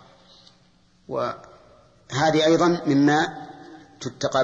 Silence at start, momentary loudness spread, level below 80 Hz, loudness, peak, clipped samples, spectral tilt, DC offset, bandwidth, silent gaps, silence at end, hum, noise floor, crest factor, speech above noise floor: 1.1 s; 21 LU; -60 dBFS; -22 LUFS; -10 dBFS; under 0.1%; -5 dB/octave; under 0.1%; 8 kHz; none; 0 s; none; -59 dBFS; 14 dB; 39 dB